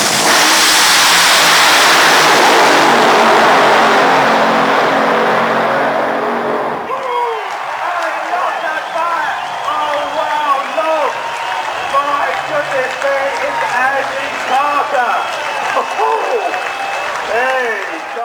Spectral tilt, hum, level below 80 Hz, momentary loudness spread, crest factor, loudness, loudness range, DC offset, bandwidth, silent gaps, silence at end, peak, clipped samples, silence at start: -1 dB/octave; none; -58 dBFS; 11 LU; 12 dB; -12 LUFS; 10 LU; under 0.1%; over 20 kHz; none; 0 s; 0 dBFS; under 0.1%; 0 s